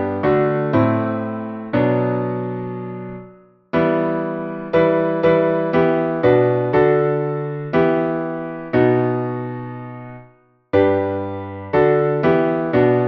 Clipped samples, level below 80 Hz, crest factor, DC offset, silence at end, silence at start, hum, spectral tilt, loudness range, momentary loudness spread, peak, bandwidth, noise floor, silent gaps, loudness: under 0.1%; -50 dBFS; 16 dB; under 0.1%; 0 s; 0 s; none; -10.5 dB/octave; 5 LU; 12 LU; -2 dBFS; 5.8 kHz; -51 dBFS; none; -18 LUFS